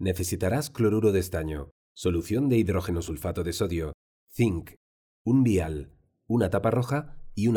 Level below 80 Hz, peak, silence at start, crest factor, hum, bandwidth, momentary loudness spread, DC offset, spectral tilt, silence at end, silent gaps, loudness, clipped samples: -44 dBFS; -10 dBFS; 0 s; 16 dB; none; 19.5 kHz; 12 LU; under 0.1%; -6.5 dB/octave; 0 s; 1.71-1.95 s, 3.94-4.27 s, 4.76-5.25 s; -27 LUFS; under 0.1%